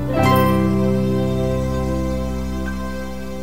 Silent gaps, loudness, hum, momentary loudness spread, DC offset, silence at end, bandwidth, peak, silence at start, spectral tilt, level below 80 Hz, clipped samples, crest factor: none; -20 LUFS; none; 12 LU; 3%; 0 s; 16 kHz; -2 dBFS; 0 s; -7 dB/octave; -30 dBFS; under 0.1%; 16 dB